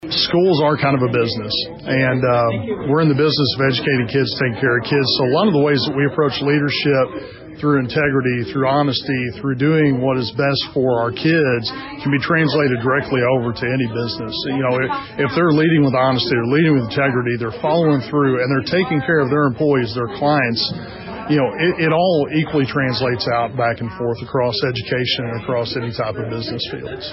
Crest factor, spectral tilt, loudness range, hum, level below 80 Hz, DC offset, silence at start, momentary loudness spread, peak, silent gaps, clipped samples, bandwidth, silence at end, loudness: 10 dB; -4.5 dB/octave; 2 LU; none; -48 dBFS; under 0.1%; 0 s; 8 LU; -6 dBFS; none; under 0.1%; 5.8 kHz; 0 s; -17 LUFS